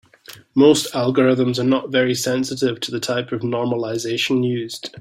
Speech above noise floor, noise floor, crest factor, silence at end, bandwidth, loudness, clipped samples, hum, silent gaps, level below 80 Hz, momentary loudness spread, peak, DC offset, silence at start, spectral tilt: 25 dB; -44 dBFS; 16 dB; 0 s; 16 kHz; -19 LUFS; under 0.1%; none; none; -60 dBFS; 9 LU; -2 dBFS; under 0.1%; 0.3 s; -5 dB/octave